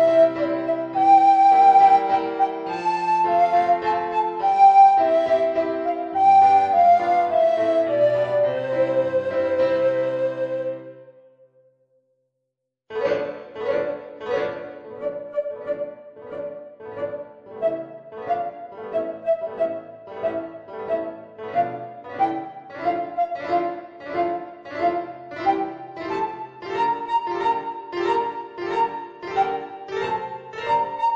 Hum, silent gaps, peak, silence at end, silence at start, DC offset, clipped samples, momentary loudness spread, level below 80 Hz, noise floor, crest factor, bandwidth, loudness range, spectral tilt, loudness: none; none; -6 dBFS; 0 s; 0 s; under 0.1%; under 0.1%; 19 LU; -66 dBFS; -80 dBFS; 16 dB; 7.6 kHz; 13 LU; -6 dB/octave; -21 LUFS